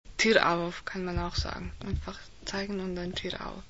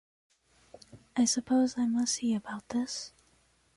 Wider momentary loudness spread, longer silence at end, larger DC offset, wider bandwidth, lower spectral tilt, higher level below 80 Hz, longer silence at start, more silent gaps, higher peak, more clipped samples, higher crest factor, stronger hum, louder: first, 13 LU vs 10 LU; second, 0.05 s vs 0.7 s; first, 0.3% vs under 0.1%; second, 8 kHz vs 11.5 kHz; first, -4.5 dB/octave vs -3 dB/octave; first, -42 dBFS vs -70 dBFS; second, 0.05 s vs 0.95 s; neither; first, -6 dBFS vs -18 dBFS; neither; first, 26 dB vs 16 dB; neither; about the same, -30 LUFS vs -30 LUFS